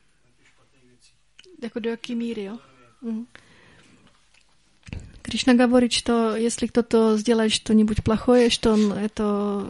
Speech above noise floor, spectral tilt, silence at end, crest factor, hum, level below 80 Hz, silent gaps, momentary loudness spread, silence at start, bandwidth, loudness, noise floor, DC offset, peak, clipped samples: 41 dB; -4.5 dB/octave; 0 s; 18 dB; none; -46 dBFS; none; 19 LU; 1.6 s; 11.5 kHz; -21 LUFS; -62 dBFS; under 0.1%; -4 dBFS; under 0.1%